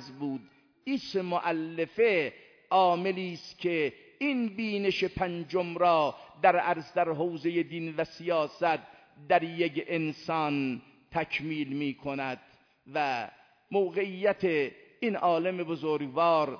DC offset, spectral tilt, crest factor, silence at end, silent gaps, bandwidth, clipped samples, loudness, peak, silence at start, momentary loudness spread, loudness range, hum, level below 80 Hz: under 0.1%; -6.5 dB/octave; 20 dB; 0 s; none; 5.4 kHz; under 0.1%; -30 LUFS; -10 dBFS; 0 s; 9 LU; 4 LU; none; -66 dBFS